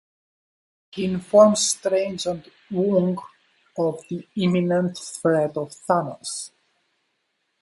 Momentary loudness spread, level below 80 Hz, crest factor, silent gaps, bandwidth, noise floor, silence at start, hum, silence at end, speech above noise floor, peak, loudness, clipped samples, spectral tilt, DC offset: 17 LU; -64 dBFS; 22 dB; none; 11.5 kHz; -73 dBFS; 0.95 s; none; 1.15 s; 52 dB; -2 dBFS; -22 LUFS; under 0.1%; -5 dB/octave; under 0.1%